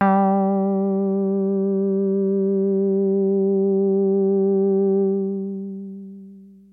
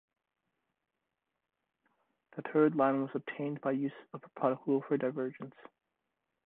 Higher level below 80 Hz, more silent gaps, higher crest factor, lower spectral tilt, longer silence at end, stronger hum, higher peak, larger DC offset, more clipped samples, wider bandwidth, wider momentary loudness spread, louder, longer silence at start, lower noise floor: first, -72 dBFS vs -82 dBFS; neither; second, 14 dB vs 22 dB; first, -13 dB/octave vs -10.5 dB/octave; second, 0.25 s vs 0.95 s; first, 60 Hz at -70 dBFS vs none; first, -6 dBFS vs -14 dBFS; neither; neither; second, 2.9 kHz vs 4 kHz; second, 10 LU vs 20 LU; first, -20 LUFS vs -33 LUFS; second, 0 s vs 2.35 s; second, -43 dBFS vs -87 dBFS